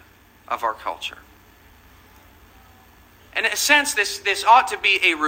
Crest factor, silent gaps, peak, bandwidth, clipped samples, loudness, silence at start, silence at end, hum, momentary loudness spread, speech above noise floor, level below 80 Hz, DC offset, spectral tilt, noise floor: 22 dB; none; 0 dBFS; 16 kHz; under 0.1%; -19 LUFS; 0.5 s; 0 s; none; 15 LU; 31 dB; -56 dBFS; under 0.1%; 0 dB/octave; -51 dBFS